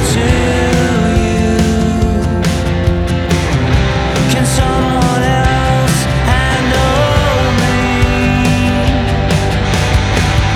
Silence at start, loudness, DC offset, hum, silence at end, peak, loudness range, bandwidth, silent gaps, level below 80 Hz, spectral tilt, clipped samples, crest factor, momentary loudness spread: 0 s; -12 LUFS; under 0.1%; none; 0 s; 0 dBFS; 1 LU; 16 kHz; none; -18 dBFS; -5.5 dB/octave; under 0.1%; 12 dB; 2 LU